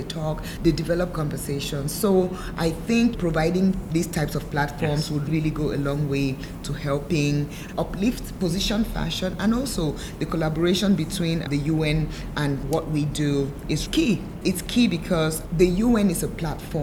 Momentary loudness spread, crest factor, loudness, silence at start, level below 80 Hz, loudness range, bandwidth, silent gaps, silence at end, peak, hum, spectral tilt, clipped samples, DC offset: 7 LU; 18 dB; -24 LUFS; 0 s; -36 dBFS; 3 LU; over 20 kHz; none; 0 s; -6 dBFS; none; -5.5 dB/octave; under 0.1%; under 0.1%